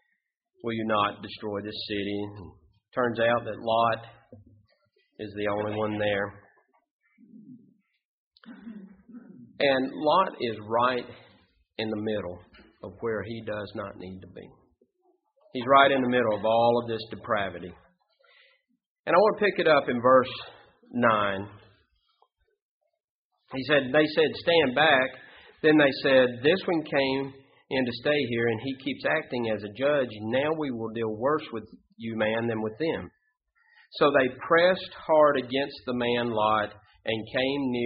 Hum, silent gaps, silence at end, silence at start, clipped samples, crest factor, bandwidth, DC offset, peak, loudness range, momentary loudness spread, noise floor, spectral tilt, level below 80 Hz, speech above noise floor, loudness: none; 6.91-6.99 s, 8.05-8.31 s, 18.86-19.04 s, 22.62-22.81 s, 23.00-23.31 s; 0 s; 0.65 s; under 0.1%; 22 dB; 5.2 kHz; under 0.1%; -4 dBFS; 9 LU; 18 LU; -78 dBFS; -3 dB/octave; -64 dBFS; 52 dB; -26 LUFS